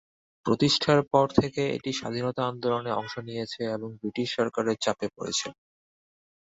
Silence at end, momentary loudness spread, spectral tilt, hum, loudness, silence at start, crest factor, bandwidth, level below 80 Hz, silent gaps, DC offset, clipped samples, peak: 1 s; 12 LU; -4.5 dB/octave; none; -27 LUFS; 0.45 s; 22 dB; 8 kHz; -60 dBFS; none; under 0.1%; under 0.1%; -6 dBFS